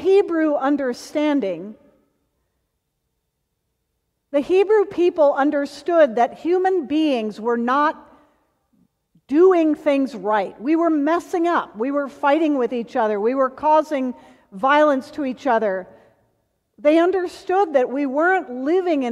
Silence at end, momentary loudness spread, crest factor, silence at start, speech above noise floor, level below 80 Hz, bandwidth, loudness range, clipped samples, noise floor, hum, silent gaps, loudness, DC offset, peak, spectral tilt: 0 s; 8 LU; 16 dB; 0 s; 56 dB; -66 dBFS; 11.5 kHz; 5 LU; under 0.1%; -74 dBFS; none; none; -19 LUFS; under 0.1%; -4 dBFS; -5.5 dB/octave